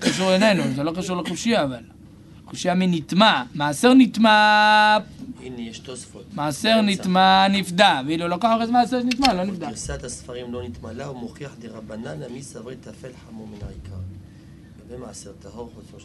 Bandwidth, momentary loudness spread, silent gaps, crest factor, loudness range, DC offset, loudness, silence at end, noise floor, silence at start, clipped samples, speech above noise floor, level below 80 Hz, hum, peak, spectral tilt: 12 kHz; 23 LU; none; 20 dB; 20 LU; under 0.1%; -19 LUFS; 0.05 s; -45 dBFS; 0 s; under 0.1%; 24 dB; -48 dBFS; none; 0 dBFS; -4.5 dB/octave